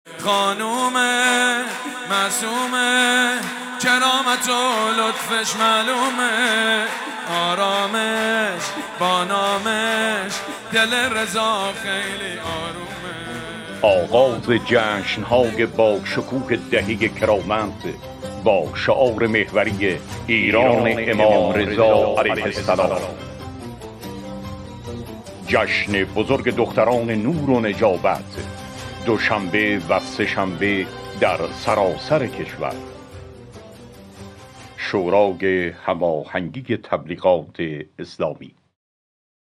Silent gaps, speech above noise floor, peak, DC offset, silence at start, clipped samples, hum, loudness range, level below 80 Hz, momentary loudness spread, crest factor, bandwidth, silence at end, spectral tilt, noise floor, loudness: none; 22 dB; -2 dBFS; under 0.1%; 0.05 s; under 0.1%; none; 6 LU; -50 dBFS; 16 LU; 18 dB; 18 kHz; 0.9 s; -3.5 dB/octave; -41 dBFS; -19 LUFS